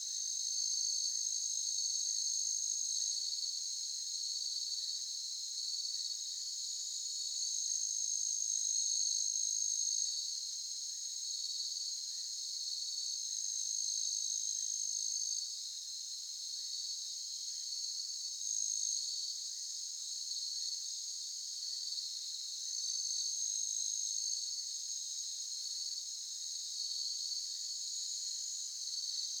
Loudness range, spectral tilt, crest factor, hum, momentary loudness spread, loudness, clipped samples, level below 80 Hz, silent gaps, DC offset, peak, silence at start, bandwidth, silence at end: 4 LU; 10.5 dB/octave; 16 dB; none; 7 LU; -36 LUFS; under 0.1%; under -90 dBFS; none; under 0.1%; -22 dBFS; 0 s; 17.5 kHz; 0 s